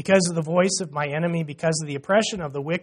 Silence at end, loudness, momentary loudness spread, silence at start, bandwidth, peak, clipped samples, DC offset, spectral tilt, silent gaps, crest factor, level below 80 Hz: 0 s; -23 LUFS; 7 LU; 0 s; 11 kHz; -6 dBFS; under 0.1%; under 0.1%; -4.5 dB/octave; none; 18 dB; -60 dBFS